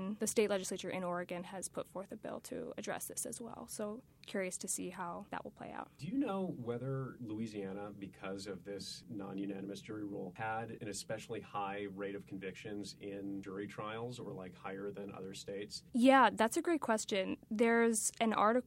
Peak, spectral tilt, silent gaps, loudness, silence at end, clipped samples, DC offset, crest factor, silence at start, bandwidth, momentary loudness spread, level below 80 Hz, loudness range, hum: -16 dBFS; -4 dB/octave; none; -38 LUFS; 0.05 s; under 0.1%; under 0.1%; 24 dB; 0 s; 16 kHz; 15 LU; -74 dBFS; 11 LU; none